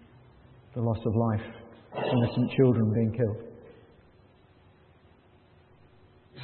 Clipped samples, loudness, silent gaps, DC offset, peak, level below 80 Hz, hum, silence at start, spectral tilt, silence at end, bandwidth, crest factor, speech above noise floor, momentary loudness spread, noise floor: under 0.1%; -28 LUFS; none; under 0.1%; -10 dBFS; -62 dBFS; none; 0.75 s; -12 dB/octave; 0 s; 4.4 kHz; 20 dB; 33 dB; 18 LU; -59 dBFS